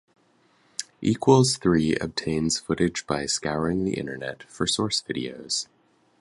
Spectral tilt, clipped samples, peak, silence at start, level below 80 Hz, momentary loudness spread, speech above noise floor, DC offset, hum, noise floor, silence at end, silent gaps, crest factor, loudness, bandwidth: -4.5 dB/octave; under 0.1%; -4 dBFS; 0.8 s; -50 dBFS; 15 LU; 38 dB; under 0.1%; none; -63 dBFS; 0.55 s; none; 22 dB; -25 LUFS; 11.5 kHz